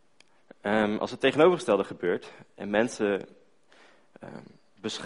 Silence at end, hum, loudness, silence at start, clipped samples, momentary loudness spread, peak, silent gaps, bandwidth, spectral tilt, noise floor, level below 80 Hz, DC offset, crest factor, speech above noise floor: 0 s; none; -27 LUFS; 0.65 s; under 0.1%; 24 LU; -8 dBFS; none; 10.5 kHz; -5 dB/octave; -64 dBFS; -64 dBFS; under 0.1%; 20 dB; 37 dB